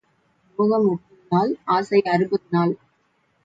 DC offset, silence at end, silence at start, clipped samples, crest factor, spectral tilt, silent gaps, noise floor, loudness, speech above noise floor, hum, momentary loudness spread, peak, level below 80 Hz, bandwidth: under 0.1%; 0.7 s; 0.6 s; under 0.1%; 16 dB; -8 dB/octave; none; -66 dBFS; -21 LUFS; 46 dB; none; 9 LU; -6 dBFS; -68 dBFS; 7.8 kHz